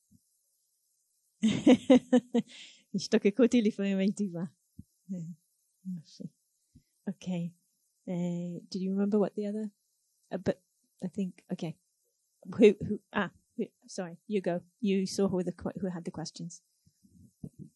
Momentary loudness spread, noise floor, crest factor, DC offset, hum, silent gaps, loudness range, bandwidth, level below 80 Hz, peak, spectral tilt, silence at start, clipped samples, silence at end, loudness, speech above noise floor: 20 LU; -77 dBFS; 24 dB; under 0.1%; none; none; 12 LU; 11.5 kHz; -66 dBFS; -8 dBFS; -6.5 dB/octave; 1.4 s; under 0.1%; 0.1 s; -31 LUFS; 48 dB